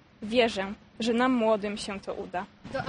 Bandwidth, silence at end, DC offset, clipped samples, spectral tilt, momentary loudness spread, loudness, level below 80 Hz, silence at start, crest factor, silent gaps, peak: 10 kHz; 0 s; under 0.1%; under 0.1%; -4.5 dB/octave; 12 LU; -29 LUFS; -58 dBFS; 0.2 s; 18 dB; none; -10 dBFS